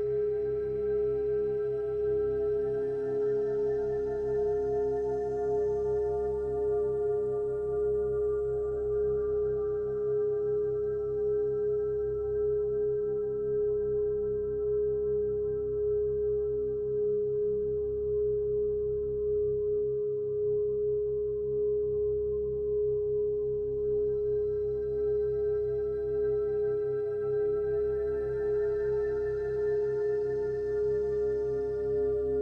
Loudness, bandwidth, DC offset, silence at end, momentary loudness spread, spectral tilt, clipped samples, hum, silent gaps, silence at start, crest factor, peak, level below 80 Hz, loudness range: -30 LUFS; 2.1 kHz; under 0.1%; 0 s; 2 LU; -9.5 dB/octave; under 0.1%; none; none; 0 s; 8 dB; -22 dBFS; -50 dBFS; 0 LU